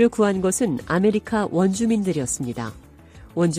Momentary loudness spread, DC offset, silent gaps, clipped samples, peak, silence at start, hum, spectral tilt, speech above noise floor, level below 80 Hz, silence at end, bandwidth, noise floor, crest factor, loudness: 10 LU; under 0.1%; none; under 0.1%; -6 dBFS; 0 s; none; -5.5 dB/octave; 24 dB; -50 dBFS; 0 s; 15.5 kHz; -45 dBFS; 16 dB; -22 LUFS